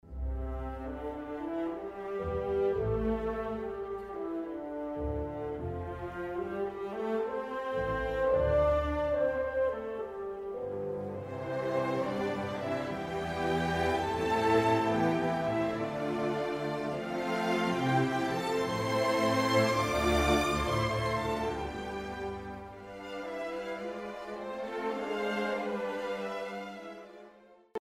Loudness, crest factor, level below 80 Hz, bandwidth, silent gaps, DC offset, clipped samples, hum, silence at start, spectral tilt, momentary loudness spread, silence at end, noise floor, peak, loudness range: -32 LUFS; 18 dB; -46 dBFS; 16 kHz; none; under 0.1%; under 0.1%; none; 0.05 s; -6 dB/octave; 12 LU; 0.05 s; -57 dBFS; -14 dBFS; 8 LU